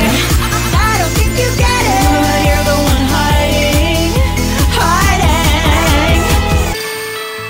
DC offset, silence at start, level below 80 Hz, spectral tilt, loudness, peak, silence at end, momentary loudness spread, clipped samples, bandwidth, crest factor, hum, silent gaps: under 0.1%; 0 s; -16 dBFS; -4.5 dB/octave; -12 LUFS; -2 dBFS; 0 s; 3 LU; under 0.1%; 16.5 kHz; 10 dB; none; none